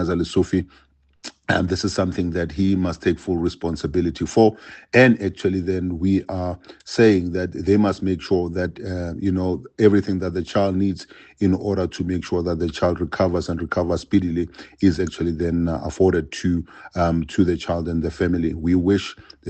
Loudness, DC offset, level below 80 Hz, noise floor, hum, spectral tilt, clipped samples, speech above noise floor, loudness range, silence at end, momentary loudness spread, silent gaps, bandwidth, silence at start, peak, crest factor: -21 LUFS; under 0.1%; -46 dBFS; -42 dBFS; none; -7 dB/octave; under 0.1%; 21 dB; 3 LU; 0 s; 9 LU; none; 8.8 kHz; 0 s; -2 dBFS; 20 dB